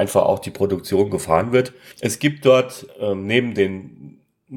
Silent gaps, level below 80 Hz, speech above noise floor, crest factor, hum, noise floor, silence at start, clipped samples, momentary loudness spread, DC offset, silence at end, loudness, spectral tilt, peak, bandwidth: none; -54 dBFS; 25 dB; 18 dB; none; -44 dBFS; 0 s; under 0.1%; 12 LU; under 0.1%; 0 s; -20 LUFS; -5 dB/octave; -2 dBFS; 18 kHz